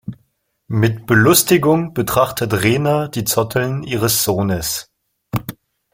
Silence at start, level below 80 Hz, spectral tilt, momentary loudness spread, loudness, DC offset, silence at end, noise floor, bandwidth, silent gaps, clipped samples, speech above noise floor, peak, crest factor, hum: 0.05 s; -46 dBFS; -4.5 dB/octave; 14 LU; -16 LUFS; under 0.1%; 0.45 s; -64 dBFS; 16.5 kHz; none; under 0.1%; 48 dB; 0 dBFS; 18 dB; none